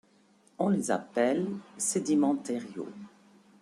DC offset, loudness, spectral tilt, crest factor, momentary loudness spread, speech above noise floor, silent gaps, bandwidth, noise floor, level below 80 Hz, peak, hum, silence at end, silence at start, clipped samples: under 0.1%; -30 LUFS; -5 dB/octave; 18 dB; 14 LU; 34 dB; none; 13.5 kHz; -64 dBFS; -76 dBFS; -14 dBFS; none; 0.55 s; 0.6 s; under 0.1%